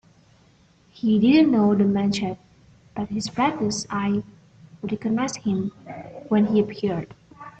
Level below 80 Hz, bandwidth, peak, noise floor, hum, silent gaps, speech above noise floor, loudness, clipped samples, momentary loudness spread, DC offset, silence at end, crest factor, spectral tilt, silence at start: -58 dBFS; 8.6 kHz; -6 dBFS; -57 dBFS; none; none; 35 dB; -23 LUFS; under 0.1%; 21 LU; under 0.1%; 0.1 s; 16 dB; -6 dB/octave; 1.05 s